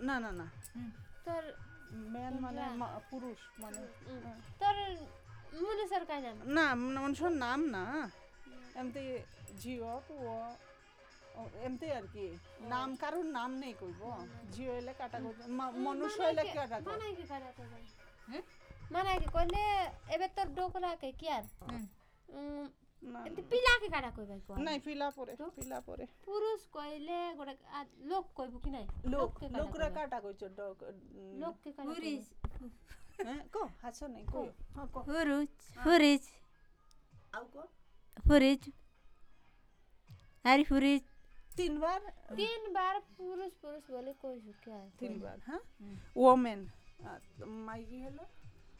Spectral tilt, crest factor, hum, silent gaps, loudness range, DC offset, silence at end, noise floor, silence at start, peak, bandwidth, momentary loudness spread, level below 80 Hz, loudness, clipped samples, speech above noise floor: -5 dB/octave; 26 dB; none; none; 11 LU; under 0.1%; 0 s; -64 dBFS; 0 s; -12 dBFS; 18 kHz; 20 LU; -50 dBFS; -37 LUFS; under 0.1%; 27 dB